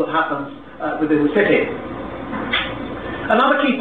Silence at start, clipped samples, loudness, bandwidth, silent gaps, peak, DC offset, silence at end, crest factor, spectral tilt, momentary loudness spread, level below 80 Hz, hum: 0 s; under 0.1%; -19 LUFS; 4.6 kHz; none; -2 dBFS; 0.5%; 0 s; 18 dB; -7.5 dB/octave; 13 LU; -46 dBFS; none